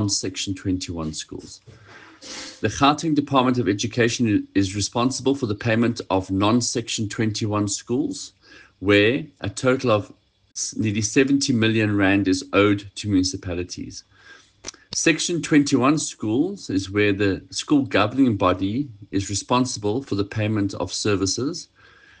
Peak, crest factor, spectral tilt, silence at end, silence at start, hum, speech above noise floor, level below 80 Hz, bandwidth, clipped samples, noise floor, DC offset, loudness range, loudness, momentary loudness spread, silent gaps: -4 dBFS; 18 dB; -4.5 dB/octave; 0.55 s; 0 s; none; 28 dB; -54 dBFS; 10 kHz; under 0.1%; -50 dBFS; under 0.1%; 3 LU; -22 LUFS; 12 LU; none